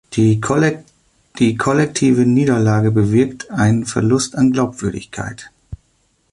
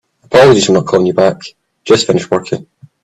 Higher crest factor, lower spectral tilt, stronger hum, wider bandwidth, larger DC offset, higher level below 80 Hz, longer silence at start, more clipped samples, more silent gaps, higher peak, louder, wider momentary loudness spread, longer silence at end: about the same, 14 dB vs 12 dB; first, -6.5 dB/octave vs -5 dB/octave; neither; about the same, 11.5 kHz vs 12 kHz; neither; about the same, -44 dBFS vs -48 dBFS; second, 0.1 s vs 0.3 s; neither; neither; about the same, -2 dBFS vs 0 dBFS; second, -16 LUFS vs -11 LUFS; about the same, 14 LU vs 16 LU; first, 0.55 s vs 0.4 s